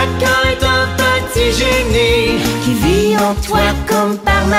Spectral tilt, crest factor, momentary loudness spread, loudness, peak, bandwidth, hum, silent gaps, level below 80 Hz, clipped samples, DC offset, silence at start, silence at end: -4.5 dB/octave; 12 dB; 2 LU; -13 LUFS; -2 dBFS; 16 kHz; none; none; -24 dBFS; under 0.1%; under 0.1%; 0 s; 0 s